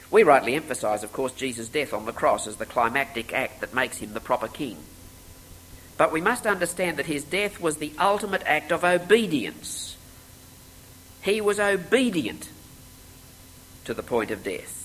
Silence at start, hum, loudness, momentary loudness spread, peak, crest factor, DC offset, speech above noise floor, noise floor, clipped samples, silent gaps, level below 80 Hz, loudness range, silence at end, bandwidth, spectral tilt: 0 s; none; -25 LUFS; 13 LU; -4 dBFS; 22 dB; under 0.1%; 23 dB; -48 dBFS; under 0.1%; none; -54 dBFS; 4 LU; 0 s; 16 kHz; -3.5 dB/octave